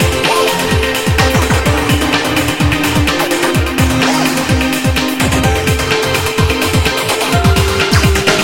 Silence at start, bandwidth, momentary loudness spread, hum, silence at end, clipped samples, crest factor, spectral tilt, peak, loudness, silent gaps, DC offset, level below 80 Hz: 0 s; 17 kHz; 2 LU; none; 0 s; under 0.1%; 12 dB; -4.5 dB/octave; 0 dBFS; -12 LUFS; none; 0.6%; -22 dBFS